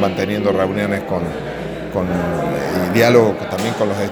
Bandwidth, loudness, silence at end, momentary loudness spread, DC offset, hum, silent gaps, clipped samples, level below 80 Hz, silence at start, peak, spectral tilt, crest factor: over 20 kHz; -18 LUFS; 0 s; 12 LU; under 0.1%; none; none; under 0.1%; -42 dBFS; 0 s; 0 dBFS; -6 dB/octave; 18 dB